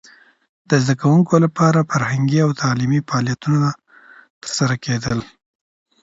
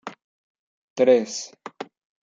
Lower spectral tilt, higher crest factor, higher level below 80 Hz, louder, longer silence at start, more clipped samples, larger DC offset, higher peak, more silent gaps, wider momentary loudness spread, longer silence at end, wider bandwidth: first, -6 dB/octave vs -3.5 dB/octave; about the same, 18 dB vs 20 dB; first, -52 dBFS vs -82 dBFS; first, -18 LUFS vs -21 LUFS; first, 0.7 s vs 0.05 s; neither; neither; first, 0 dBFS vs -6 dBFS; second, 4.30-4.41 s vs 0.24-0.96 s; second, 9 LU vs 22 LU; first, 0.75 s vs 0.4 s; about the same, 8 kHz vs 7.8 kHz